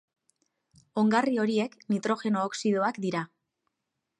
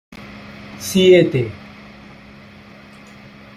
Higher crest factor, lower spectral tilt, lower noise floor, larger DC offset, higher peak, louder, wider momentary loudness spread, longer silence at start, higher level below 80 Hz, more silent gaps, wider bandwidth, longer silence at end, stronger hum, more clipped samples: about the same, 18 dB vs 18 dB; about the same, -5.5 dB/octave vs -5.5 dB/octave; first, -84 dBFS vs -41 dBFS; neither; second, -12 dBFS vs -2 dBFS; second, -28 LUFS vs -15 LUFS; second, 8 LU vs 27 LU; first, 0.95 s vs 0.1 s; second, -78 dBFS vs -52 dBFS; neither; second, 10 kHz vs 15 kHz; second, 0.95 s vs 2 s; neither; neither